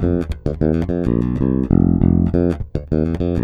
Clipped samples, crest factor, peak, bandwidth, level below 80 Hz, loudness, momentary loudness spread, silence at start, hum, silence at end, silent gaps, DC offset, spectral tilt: under 0.1%; 16 dB; 0 dBFS; 5.2 kHz; -28 dBFS; -18 LUFS; 6 LU; 0 s; none; 0 s; none; under 0.1%; -10.5 dB/octave